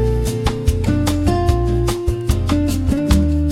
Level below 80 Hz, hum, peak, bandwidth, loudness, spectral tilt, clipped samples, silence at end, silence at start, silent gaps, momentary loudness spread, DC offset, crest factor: -22 dBFS; none; -2 dBFS; 16 kHz; -18 LUFS; -6.5 dB/octave; under 0.1%; 0 s; 0 s; none; 4 LU; under 0.1%; 14 dB